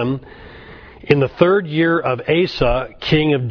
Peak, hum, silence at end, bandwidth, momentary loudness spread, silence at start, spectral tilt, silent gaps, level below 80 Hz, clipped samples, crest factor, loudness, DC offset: 0 dBFS; none; 0 s; 5.4 kHz; 7 LU; 0 s; -8 dB/octave; none; -36 dBFS; under 0.1%; 18 dB; -17 LUFS; under 0.1%